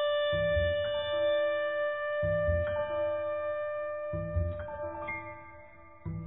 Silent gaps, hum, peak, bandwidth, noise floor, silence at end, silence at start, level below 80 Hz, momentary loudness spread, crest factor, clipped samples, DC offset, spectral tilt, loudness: none; none; -18 dBFS; 3.8 kHz; -53 dBFS; 0 s; 0 s; -46 dBFS; 12 LU; 14 dB; under 0.1%; 0.1%; -9 dB/octave; -32 LUFS